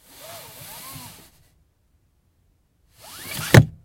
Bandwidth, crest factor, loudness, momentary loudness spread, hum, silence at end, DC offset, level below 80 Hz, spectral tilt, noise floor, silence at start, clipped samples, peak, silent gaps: 16.5 kHz; 24 dB; -18 LUFS; 25 LU; none; 0.15 s; under 0.1%; -48 dBFS; -5.5 dB/octave; -64 dBFS; 3.25 s; under 0.1%; 0 dBFS; none